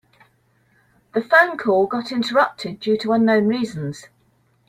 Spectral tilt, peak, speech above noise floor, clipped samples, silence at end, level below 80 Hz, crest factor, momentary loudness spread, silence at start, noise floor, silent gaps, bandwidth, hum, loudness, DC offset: -6 dB/octave; -2 dBFS; 42 dB; under 0.1%; 0.65 s; -64 dBFS; 20 dB; 12 LU; 1.15 s; -61 dBFS; none; 14.5 kHz; none; -19 LUFS; under 0.1%